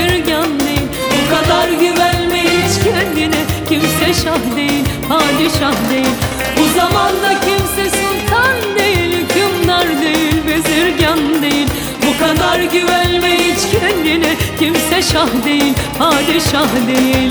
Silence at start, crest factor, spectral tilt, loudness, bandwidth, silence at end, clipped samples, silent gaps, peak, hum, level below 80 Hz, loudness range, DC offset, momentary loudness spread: 0 s; 12 dB; -4 dB/octave; -13 LUFS; over 20 kHz; 0 s; under 0.1%; none; 0 dBFS; none; -32 dBFS; 1 LU; under 0.1%; 3 LU